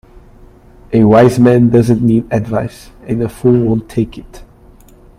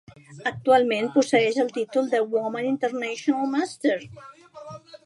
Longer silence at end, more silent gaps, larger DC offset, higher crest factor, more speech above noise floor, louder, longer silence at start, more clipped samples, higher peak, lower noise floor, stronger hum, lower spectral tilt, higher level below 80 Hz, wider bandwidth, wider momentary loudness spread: first, 0.8 s vs 0.1 s; neither; neither; second, 12 dB vs 18 dB; first, 30 dB vs 19 dB; first, -12 LUFS vs -24 LUFS; first, 0.9 s vs 0.3 s; neither; first, 0 dBFS vs -6 dBFS; about the same, -41 dBFS vs -42 dBFS; neither; first, -8.5 dB/octave vs -4.5 dB/octave; first, -38 dBFS vs -68 dBFS; first, 14.5 kHz vs 11.5 kHz; second, 12 LU vs 18 LU